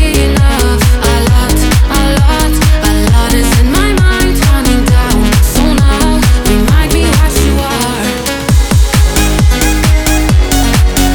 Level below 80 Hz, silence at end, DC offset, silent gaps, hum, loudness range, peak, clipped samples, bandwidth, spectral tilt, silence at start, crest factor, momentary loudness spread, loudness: -10 dBFS; 0 s; under 0.1%; none; none; 1 LU; 0 dBFS; under 0.1%; 20 kHz; -5 dB/octave; 0 s; 8 dB; 1 LU; -10 LUFS